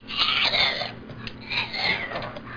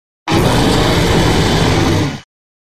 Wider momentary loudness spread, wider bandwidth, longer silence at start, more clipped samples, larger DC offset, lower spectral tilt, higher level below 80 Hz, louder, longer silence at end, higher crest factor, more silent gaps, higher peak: first, 17 LU vs 5 LU; second, 5.4 kHz vs 16 kHz; second, 0 s vs 0.25 s; neither; neither; second, -3.5 dB/octave vs -5 dB/octave; second, -50 dBFS vs -24 dBFS; second, -23 LUFS vs -13 LUFS; second, 0 s vs 0.45 s; about the same, 18 dB vs 14 dB; neither; second, -8 dBFS vs 0 dBFS